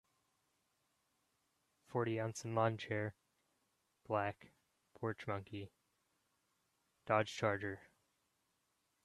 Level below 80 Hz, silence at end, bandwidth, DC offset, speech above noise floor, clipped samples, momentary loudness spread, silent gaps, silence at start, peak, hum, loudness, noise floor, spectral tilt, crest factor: -80 dBFS; 1.2 s; 12.5 kHz; under 0.1%; 43 dB; under 0.1%; 14 LU; none; 1.9 s; -18 dBFS; none; -40 LUFS; -83 dBFS; -6 dB/octave; 26 dB